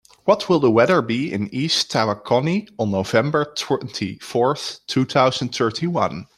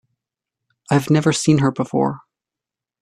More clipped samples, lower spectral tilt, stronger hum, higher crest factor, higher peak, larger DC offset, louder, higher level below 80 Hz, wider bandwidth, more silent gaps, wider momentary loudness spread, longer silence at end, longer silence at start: neither; about the same, -5 dB/octave vs -6 dB/octave; neither; about the same, 18 dB vs 18 dB; about the same, -2 dBFS vs -2 dBFS; neither; about the same, -20 LUFS vs -18 LUFS; about the same, -60 dBFS vs -56 dBFS; about the same, 14.5 kHz vs 13.5 kHz; neither; about the same, 7 LU vs 6 LU; second, 0.15 s vs 0.85 s; second, 0.25 s vs 0.9 s